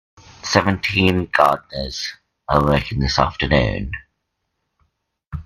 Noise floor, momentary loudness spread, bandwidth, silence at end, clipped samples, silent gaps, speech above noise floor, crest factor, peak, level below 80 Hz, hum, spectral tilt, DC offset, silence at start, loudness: -75 dBFS; 15 LU; 15.5 kHz; 0.05 s; under 0.1%; 5.27-5.31 s; 56 dB; 20 dB; 0 dBFS; -34 dBFS; none; -5 dB/octave; under 0.1%; 0.45 s; -19 LUFS